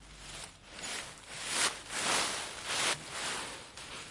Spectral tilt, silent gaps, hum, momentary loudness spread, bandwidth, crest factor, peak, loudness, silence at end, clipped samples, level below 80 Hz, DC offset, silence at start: 0 dB/octave; none; none; 14 LU; 11.5 kHz; 22 dB; -16 dBFS; -34 LUFS; 0 s; under 0.1%; -62 dBFS; under 0.1%; 0 s